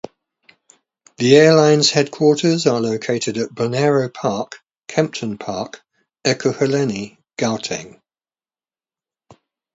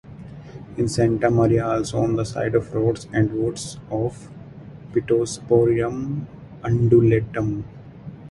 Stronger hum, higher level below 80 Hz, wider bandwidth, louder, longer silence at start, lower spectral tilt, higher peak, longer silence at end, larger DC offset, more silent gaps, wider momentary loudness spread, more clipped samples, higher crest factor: neither; second, -62 dBFS vs -46 dBFS; second, 8 kHz vs 11.5 kHz; first, -17 LUFS vs -21 LUFS; first, 1.2 s vs 0.05 s; second, -4.5 dB/octave vs -7 dB/octave; first, 0 dBFS vs -4 dBFS; first, 1.85 s vs 0 s; neither; neither; second, 16 LU vs 22 LU; neither; about the same, 18 dB vs 18 dB